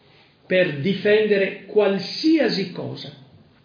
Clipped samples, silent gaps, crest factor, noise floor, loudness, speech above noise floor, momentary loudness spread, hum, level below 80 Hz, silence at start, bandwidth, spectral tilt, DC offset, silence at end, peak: under 0.1%; none; 16 dB; -54 dBFS; -20 LUFS; 33 dB; 14 LU; none; -66 dBFS; 0.5 s; 5.2 kHz; -6.5 dB/octave; under 0.1%; 0.5 s; -6 dBFS